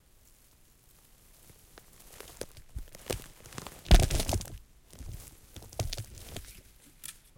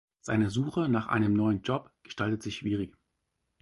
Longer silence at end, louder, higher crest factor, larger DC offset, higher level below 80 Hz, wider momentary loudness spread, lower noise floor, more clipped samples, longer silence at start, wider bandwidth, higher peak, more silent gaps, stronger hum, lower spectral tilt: second, 0.25 s vs 0.75 s; second, -34 LUFS vs -30 LUFS; first, 28 dB vs 16 dB; neither; first, -36 dBFS vs -56 dBFS; first, 28 LU vs 8 LU; second, -61 dBFS vs -80 dBFS; neither; first, 2.25 s vs 0.25 s; first, 17 kHz vs 11.5 kHz; first, -6 dBFS vs -14 dBFS; neither; neither; second, -4.5 dB/octave vs -7 dB/octave